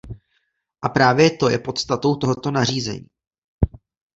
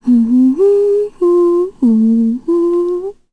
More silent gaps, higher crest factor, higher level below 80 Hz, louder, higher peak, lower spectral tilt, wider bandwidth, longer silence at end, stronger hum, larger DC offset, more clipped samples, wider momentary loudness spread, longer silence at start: first, 3.27-3.31 s, 3.38-3.59 s vs none; first, 20 dB vs 8 dB; first, -38 dBFS vs -50 dBFS; second, -20 LUFS vs -13 LUFS; about the same, -2 dBFS vs -4 dBFS; second, -5 dB/octave vs -9.5 dB/octave; about the same, 8 kHz vs 8.4 kHz; first, 0.5 s vs 0.2 s; neither; neither; neither; first, 13 LU vs 5 LU; about the same, 0.05 s vs 0.05 s